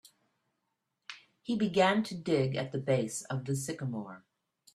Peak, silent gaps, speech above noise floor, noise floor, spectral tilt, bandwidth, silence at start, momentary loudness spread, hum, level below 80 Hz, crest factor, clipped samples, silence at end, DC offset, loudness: -12 dBFS; none; 52 dB; -83 dBFS; -5.5 dB/octave; 14 kHz; 1.1 s; 21 LU; none; -70 dBFS; 22 dB; under 0.1%; 0.55 s; under 0.1%; -32 LUFS